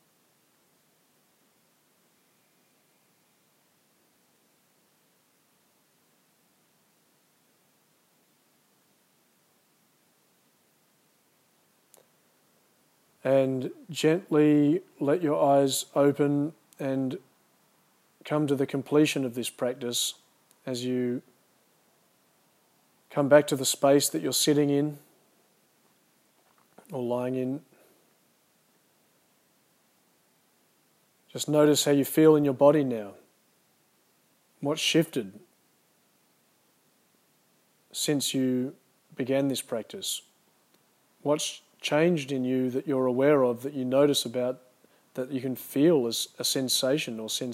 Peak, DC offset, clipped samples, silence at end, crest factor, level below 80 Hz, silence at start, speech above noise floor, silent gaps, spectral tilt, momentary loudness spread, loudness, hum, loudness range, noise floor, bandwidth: -6 dBFS; under 0.1%; under 0.1%; 0 s; 24 dB; -86 dBFS; 13.25 s; 42 dB; none; -4.5 dB/octave; 14 LU; -26 LUFS; none; 12 LU; -67 dBFS; 16 kHz